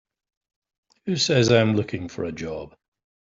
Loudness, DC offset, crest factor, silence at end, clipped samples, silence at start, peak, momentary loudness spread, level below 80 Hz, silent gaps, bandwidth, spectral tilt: -22 LUFS; under 0.1%; 20 dB; 0.55 s; under 0.1%; 1.05 s; -6 dBFS; 16 LU; -56 dBFS; none; 7.8 kHz; -5 dB/octave